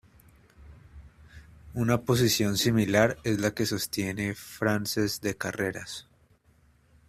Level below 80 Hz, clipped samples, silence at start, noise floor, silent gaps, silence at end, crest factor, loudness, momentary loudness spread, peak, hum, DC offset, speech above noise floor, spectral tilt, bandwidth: -54 dBFS; under 0.1%; 0.6 s; -63 dBFS; none; 1.05 s; 22 dB; -27 LUFS; 10 LU; -8 dBFS; none; under 0.1%; 35 dB; -4.5 dB/octave; 16 kHz